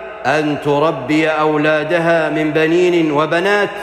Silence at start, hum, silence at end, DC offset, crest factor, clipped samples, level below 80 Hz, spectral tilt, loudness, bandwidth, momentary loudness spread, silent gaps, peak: 0 s; none; 0 s; under 0.1%; 12 dB; under 0.1%; -52 dBFS; -6 dB/octave; -15 LUFS; 12.5 kHz; 3 LU; none; -4 dBFS